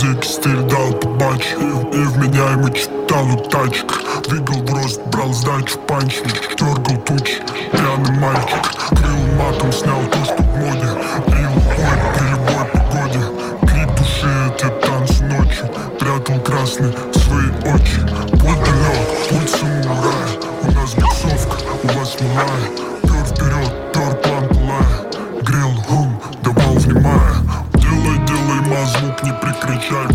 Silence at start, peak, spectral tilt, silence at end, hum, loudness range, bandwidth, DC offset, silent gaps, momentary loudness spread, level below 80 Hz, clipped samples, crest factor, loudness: 0 s; -2 dBFS; -5.5 dB/octave; 0 s; none; 3 LU; 16.5 kHz; under 0.1%; none; 5 LU; -22 dBFS; under 0.1%; 14 dB; -16 LUFS